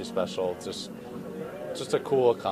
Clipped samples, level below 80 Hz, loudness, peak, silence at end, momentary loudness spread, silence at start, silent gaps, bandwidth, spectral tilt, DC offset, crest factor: under 0.1%; -64 dBFS; -30 LUFS; -10 dBFS; 0 s; 15 LU; 0 s; none; 15 kHz; -5 dB/octave; under 0.1%; 18 dB